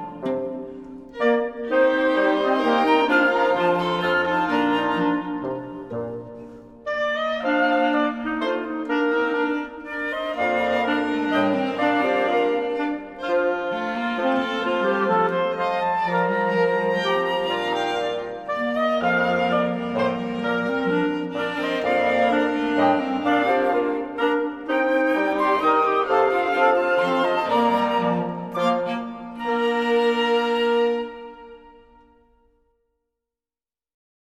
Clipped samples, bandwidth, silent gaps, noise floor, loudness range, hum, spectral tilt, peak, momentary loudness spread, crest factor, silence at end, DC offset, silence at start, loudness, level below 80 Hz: under 0.1%; 12.5 kHz; none; under -90 dBFS; 4 LU; none; -6 dB/octave; -6 dBFS; 9 LU; 16 dB; 2.5 s; under 0.1%; 0 s; -22 LUFS; -58 dBFS